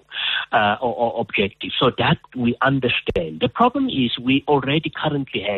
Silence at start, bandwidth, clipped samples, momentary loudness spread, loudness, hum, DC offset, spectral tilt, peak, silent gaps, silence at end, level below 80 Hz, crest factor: 0.1 s; 4.4 kHz; under 0.1%; 5 LU; -20 LUFS; none; under 0.1%; -8 dB/octave; -4 dBFS; none; 0 s; -48 dBFS; 16 dB